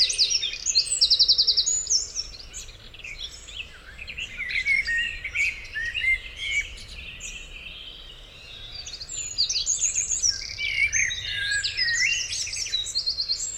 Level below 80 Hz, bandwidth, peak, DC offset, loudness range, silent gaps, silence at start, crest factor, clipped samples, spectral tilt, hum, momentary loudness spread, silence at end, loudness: -46 dBFS; 17 kHz; -6 dBFS; under 0.1%; 8 LU; none; 0 s; 20 dB; under 0.1%; 2 dB/octave; none; 19 LU; 0 s; -22 LUFS